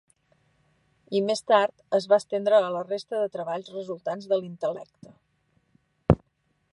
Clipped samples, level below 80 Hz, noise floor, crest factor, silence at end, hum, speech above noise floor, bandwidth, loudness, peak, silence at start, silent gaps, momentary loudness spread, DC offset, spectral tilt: under 0.1%; -48 dBFS; -72 dBFS; 26 dB; 0.55 s; none; 47 dB; 11.5 kHz; -26 LUFS; 0 dBFS; 1.1 s; none; 11 LU; under 0.1%; -6 dB/octave